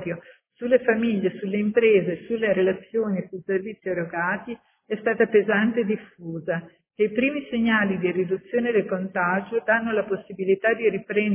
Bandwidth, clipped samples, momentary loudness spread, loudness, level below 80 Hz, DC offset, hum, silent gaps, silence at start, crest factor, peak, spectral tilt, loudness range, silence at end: 3.6 kHz; under 0.1%; 10 LU; -24 LUFS; -62 dBFS; under 0.1%; none; none; 0 s; 18 dB; -6 dBFS; -10.5 dB/octave; 2 LU; 0 s